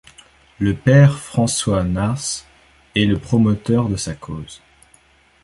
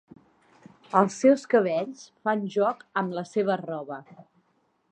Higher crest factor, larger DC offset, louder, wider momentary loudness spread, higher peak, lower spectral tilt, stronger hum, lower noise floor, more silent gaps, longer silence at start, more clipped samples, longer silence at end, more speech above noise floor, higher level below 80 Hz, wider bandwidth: about the same, 18 dB vs 22 dB; neither; first, -18 LUFS vs -25 LUFS; about the same, 16 LU vs 14 LU; about the same, -2 dBFS vs -4 dBFS; about the same, -5.5 dB/octave vs -6 dB/octave; neither; second, -54 dBFS vs -70 dBFS; neither; second, 0.6 s vs 0.9 s; neither; first, 0.85 s vs 0.7 s; second, 37 dB vs 45 dB; first, -40 dBFS vs -78 dBFS; first, 11.5 kHz vs 9.4 kHz